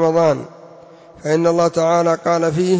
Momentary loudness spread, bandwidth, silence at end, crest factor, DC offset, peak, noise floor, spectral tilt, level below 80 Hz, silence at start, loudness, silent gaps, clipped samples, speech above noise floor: 10 LU; 8 kHz; 0 s; 12 dB; under 0.1%; -6 dBFS; -42 dBFS; -6 dB/octave; -56 dBFS; 0 s; -16 LUFS; none; under 0.1%; 26 dB